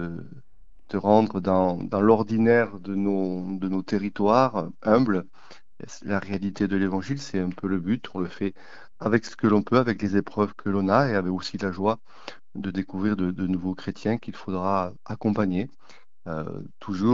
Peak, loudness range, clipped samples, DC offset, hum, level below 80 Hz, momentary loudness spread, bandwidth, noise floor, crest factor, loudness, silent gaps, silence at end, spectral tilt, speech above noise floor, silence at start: -4 dBFS; 6 LU; under 0.1%; 0.9%; none; -58 dBFS; 13 LU; 7.6 kHz; -55 dBFS; 20 dB; -25 LUFS; none; 0 s; -7.5 dB/octave; 31 dB; 0 s